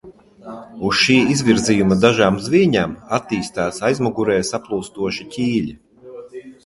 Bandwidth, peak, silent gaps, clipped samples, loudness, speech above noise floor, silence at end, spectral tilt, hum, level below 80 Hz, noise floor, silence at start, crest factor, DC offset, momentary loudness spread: 11.5 kHz; 0 dBFS; none; under 0.1%; -18 LUFS; 20 dB; 0.15 s; -5 dB/octave; none; -48 dBFS; -37 dBFS; 0.05 s; 18 dB; under 0.1%; 21 LU